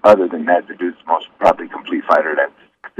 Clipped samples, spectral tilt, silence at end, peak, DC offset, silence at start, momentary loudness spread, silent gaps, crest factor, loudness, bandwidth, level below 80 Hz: under 0.1%; -6 dB/octave; 0.15 s; 0 dBFS; under 0.1%; 0.05 s; 10 LU; none; 16 dB; -17 LUFS; 10 kHz; -54 dBFS